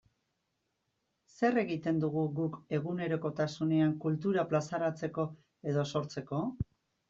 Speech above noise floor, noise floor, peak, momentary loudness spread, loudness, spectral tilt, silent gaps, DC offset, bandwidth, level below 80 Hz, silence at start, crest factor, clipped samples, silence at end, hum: 50 dB; -82 dBFS; -16 dBFS; 8 LU; -33 LUFS; -7 dB/octave; none; under 0.1%; 7.6 kHz; -62 dBFS; 1.4 s; 18 dB; under 0.1%; 0.45 s; none